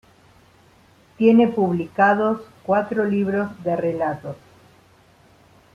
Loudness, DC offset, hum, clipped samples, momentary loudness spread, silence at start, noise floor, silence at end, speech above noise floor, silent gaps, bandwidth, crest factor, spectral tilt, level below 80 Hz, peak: -20 LUFS; under 0.1%; none; under 0.1%; 12 LU; 1.2 s; -54 dBFS; 1.4 s; 34 dB; none; 6.8 kHz; 20 dB; -8.5 dB/octave; -62 dBFS; -2 dBFS